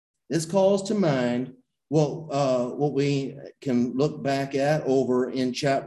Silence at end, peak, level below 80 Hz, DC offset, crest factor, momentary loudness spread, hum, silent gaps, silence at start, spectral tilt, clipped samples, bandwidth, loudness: 0 s; -8 dBFS; -64 dBFS; under 0.1%; 16 dB; 7 LU; none; none; 0.3 s; -6 dB/octave; under 0.1%; 12 kHz; -25 LUFS